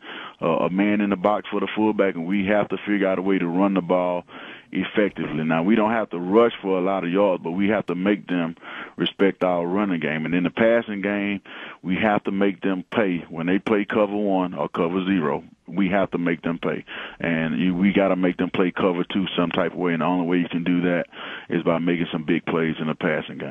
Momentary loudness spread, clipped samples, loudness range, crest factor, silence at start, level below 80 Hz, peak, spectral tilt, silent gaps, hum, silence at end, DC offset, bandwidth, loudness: 7 LU; under 0.1%; 2 LU; 18 dB; 0.05 s; -58 dBFS; -4 dBFS; -8.5 dB/octave; none; none; 0 s; under 0.1%; 4 kHz; -23 LUFS